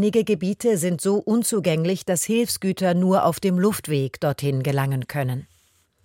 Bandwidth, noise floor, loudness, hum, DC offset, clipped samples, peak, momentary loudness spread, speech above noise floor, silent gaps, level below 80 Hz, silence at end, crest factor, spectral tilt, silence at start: 17 kHz; -62 dBFS; -22 LUFS; none; under 0.1%; under 0.1%; -8 dBFS; 6 LU; 41 dB; none; -60 dBFS; 0.6 s; 14 dB; -5.5 dB/octave; 0 s